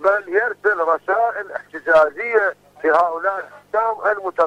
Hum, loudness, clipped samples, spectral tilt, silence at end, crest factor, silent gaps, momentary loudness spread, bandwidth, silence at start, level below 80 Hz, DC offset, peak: 50 Hz at -60 dBFS; -19 LUFS; under 0.1%; -4.5 dB/octave; 0 s; 14 dB; none; 9 LU; 10 kHz; 0 s; -62 dBFS; under 0.1%; -4 dBFS